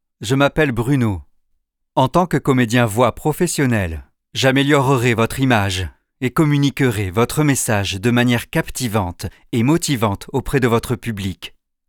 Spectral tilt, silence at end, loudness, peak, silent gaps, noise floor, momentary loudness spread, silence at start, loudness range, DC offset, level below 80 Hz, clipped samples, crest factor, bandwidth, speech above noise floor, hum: -5.5 dB/octave; 0.4 s; -18 LUFS; -2 dBFS; none; -67 dBFS; 10 LU; 0.2 s; 2 LU; under 0.1%; -40 dBFS; under 0.1%; 16 dB; 19.5 kHz; 50 dB; none